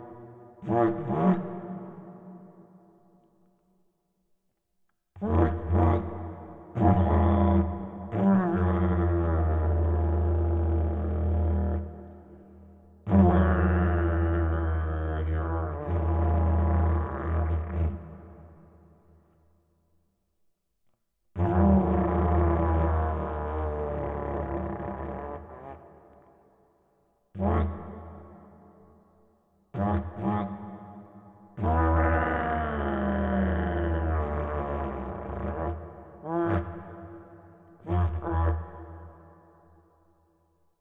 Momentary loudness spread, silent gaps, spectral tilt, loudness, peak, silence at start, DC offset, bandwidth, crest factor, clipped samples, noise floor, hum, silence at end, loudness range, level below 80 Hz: 21 LU; none; -11.5 dB/octave; -27 LUFS; -8 dBFS; 0 s; under 0.1%; 3.7 kHz; 20 dB; under 0.1%; -75 dBFS; none; 1.7 s; 10 LU; -34 dBFS